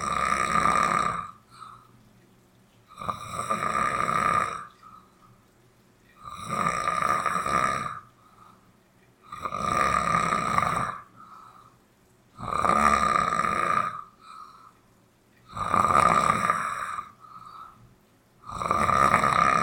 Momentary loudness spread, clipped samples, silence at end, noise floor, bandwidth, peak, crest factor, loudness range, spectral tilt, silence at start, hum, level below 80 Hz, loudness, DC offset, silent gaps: 24 LU; under 0.1%; 0 s; -61 dBFS; 18 kHz; -2 dBFS; 24 dB; 3 LU; -4 dB/octave; 0 s; none; -50 dBFS; -25 LUFS; under 0.1%; none